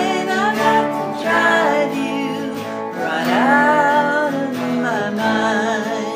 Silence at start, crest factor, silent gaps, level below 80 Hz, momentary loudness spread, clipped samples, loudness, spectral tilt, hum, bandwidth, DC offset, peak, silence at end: 0 s; 16 dB; none; -72 dBFS; 9 LU; under 0.1%; -17 LUFS; -4.5 dB/octave; none; 15.5 kHz; under 0.1%; -2 dBFS; 0 s